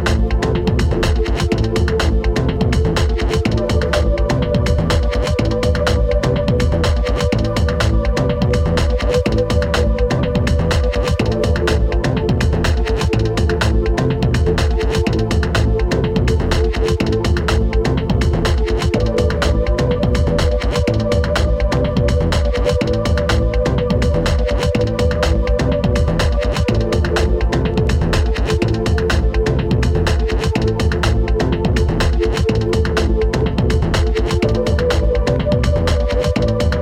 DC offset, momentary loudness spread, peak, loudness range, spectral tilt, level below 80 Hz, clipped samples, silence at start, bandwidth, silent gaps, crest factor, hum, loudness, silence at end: under 0.1%; 1 LU; -2 dBFS; 0 LU; -6.5 dB/octave; -18 dBFS; under 0.1%; 0 s; 13 kHz; none; 12 dB; none; -17 LUFS; 0 s